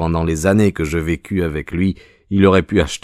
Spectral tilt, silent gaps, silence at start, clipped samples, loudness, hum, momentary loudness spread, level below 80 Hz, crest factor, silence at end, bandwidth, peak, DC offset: -6.5 dB/octave; none; 0 s; under 0.1%; -17 LUFS; none; 8 LU; -32 dBFS; 14 dB; 0.05 s; 14.5 kHz; -2 dBFS; under 0.1%